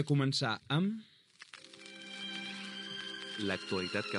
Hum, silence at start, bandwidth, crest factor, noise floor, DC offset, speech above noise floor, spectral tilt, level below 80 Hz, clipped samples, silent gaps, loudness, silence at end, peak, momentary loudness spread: none; 0 s; 11.5 kHz; 20 dB; -56 dBFS; under 0.1%; 23 dB; -5 dB/octave; -82 dBFS; under 0.1%; none; -36 LUFS; 0 s; -18 dBFS; 19 LU